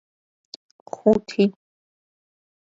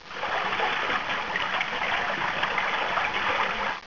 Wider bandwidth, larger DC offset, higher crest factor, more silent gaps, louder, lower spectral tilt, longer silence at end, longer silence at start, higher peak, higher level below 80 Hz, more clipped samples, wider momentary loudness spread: first, 7.6 kHz vs 6 kHz; second, under 0.1% vs 0.6%; first, 22 dB vs 16 dB; neither; first, -21 LUFS vs -26 LUFS; first, -7 dB/octave vs -2.5 dB/octave; first, 1.2 s vs 0 s; first, 1.05 s vs 0 s; first, -4 dBFS vs -12 dBFS; second, -60 dBFS vs -54 dBFS; neither; first, 23 LU vs 2 LU